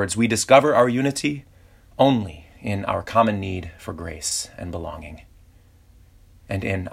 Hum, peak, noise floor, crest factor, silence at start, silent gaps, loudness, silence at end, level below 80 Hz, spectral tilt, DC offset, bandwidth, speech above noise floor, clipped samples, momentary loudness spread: none; -2 dBFS; -52 dBFS; 22 dB; 0 s; none; -21 LUFS; 0 s; -48 dBFS; -4.5 dB/octave; under 0.1%; 16 kHz; 31 dB; under 0.1%; 20 LU